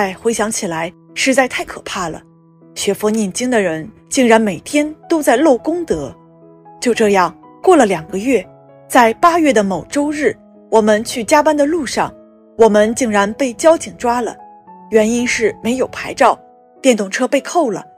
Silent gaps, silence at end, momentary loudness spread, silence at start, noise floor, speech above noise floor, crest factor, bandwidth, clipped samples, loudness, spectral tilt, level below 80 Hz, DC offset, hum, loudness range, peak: none; 0.15 s; 11 LU; 0 s; -43 dBFS; 29 dB; 16 dB; 15.5 kHz; under 0.1%; -15 LUFS; -4 dB/octave; -48 dBFS; under 0.1%; none; 3 LU; 0 dBFS